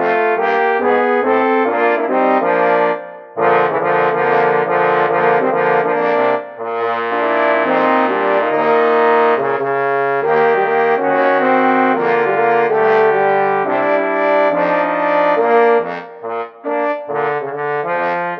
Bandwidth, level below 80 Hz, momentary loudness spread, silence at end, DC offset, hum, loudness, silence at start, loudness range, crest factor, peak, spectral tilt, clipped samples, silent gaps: 6 kHz; -70 dBFS; 7 LU; 0 s; under 0.1%; none; -15 LUFS; 0 s; 2 LU; 14 dB; 0 dBFS; -7.5 dB/octave; under 0.1%; none